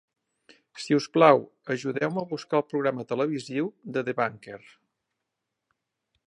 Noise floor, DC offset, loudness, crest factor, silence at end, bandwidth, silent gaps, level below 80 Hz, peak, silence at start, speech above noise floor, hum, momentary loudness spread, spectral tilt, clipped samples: -84 dBFS; under 0.1%; -26 LUFS; 24 dB; 1.7 s; 11 kHz; none; -78 dBFS; -4 dBFS; 0.75 s; 58 dB; none; 14 LU; -6 dB/octave; under 0.1%